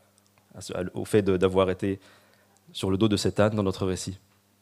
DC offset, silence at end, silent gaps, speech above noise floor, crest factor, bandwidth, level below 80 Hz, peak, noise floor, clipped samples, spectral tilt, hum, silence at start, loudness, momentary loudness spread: under 0.1%; 0.45 s; none; 37 dB; 20 dB; 15.5 kHz; -58 dBFS; -8 dBFS; -62 dBFS; under 0.1%; -6 dB/octave; none; 0.55 s; -26 LUFS; 14 LU